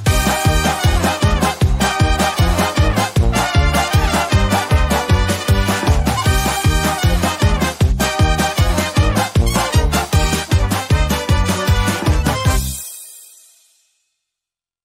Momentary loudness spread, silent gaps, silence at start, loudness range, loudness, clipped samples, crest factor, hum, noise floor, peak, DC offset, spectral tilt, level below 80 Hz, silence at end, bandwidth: 2 LU; none; 0 s; 3 LU; -16 LUFS; under 0.1%; 12 dB; none; -87 dBFS; -2 dBFS; under 0.1%; -4.5 dB/octave; -20 dBFS; 1.6 s; 16 kHz